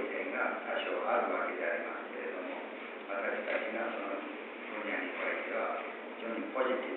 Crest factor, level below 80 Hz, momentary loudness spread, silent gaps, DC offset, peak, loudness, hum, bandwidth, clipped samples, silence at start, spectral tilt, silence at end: 16 dB; under -90 dBFS; 9 LU; none; under 0.1%; -20 dBFS; -36 LUFS; none; 4.3 kHz; under 0.1%; 0 s; -0.5 dB/octave; 0 s